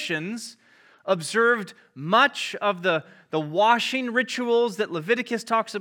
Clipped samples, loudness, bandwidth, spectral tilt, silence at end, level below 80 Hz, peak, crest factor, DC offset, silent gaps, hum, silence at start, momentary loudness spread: under 0.1%; -23 LUFS; 17 kHz; -4 dB/octave; 0 s; -88 dBFS; -6 dBFS; 20 dB; under 0.1%; none; none; 0 s; 13 LU